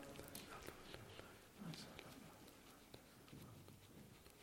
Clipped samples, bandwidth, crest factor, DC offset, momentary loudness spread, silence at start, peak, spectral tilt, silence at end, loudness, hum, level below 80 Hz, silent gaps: under 0.1%; 16.5 kHz; 26 dB; under 0.1%; 8 LU; 0 s; -32 dBFS; -4 dB/octave; 0 s; -58 LUFS; none; -74 dBFS; none